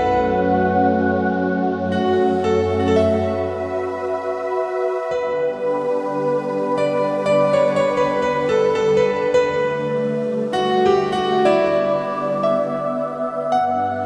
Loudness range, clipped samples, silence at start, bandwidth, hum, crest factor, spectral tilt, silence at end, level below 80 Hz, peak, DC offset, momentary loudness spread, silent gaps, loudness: 3 LU; under 0.1%; 0 s; 10.5 kHz; none; 14 dB; -6.5 dB/octave; 0 s; -50 dBFS; -4 dBFS; under 0.1%; 6 LU; none; -19 LUFS